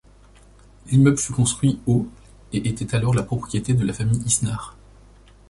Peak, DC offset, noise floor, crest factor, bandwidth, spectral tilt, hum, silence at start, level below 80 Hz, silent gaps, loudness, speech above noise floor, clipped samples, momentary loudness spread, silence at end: -6 dBFS; under 0.1%; -50 dBFS; 18 dB; 11.5 kHz; -5.5 dB/octave; none; 0.85 s; -44 dBFS; none; -21 LUFS; 29 dB; under 0.1%; 10 LU; 0.8 s